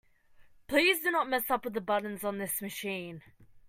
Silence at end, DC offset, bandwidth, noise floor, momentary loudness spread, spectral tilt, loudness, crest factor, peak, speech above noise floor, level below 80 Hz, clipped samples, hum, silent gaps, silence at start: 0.1 s; under 0.1%; 16 kHz; -58 dBFS; 12 LU; -3 dB/octave; -30 LUFS; 20 dB; -12 dBFS; 27 dB; -66 dBFS; under 0.1%; none; none; 0.4 s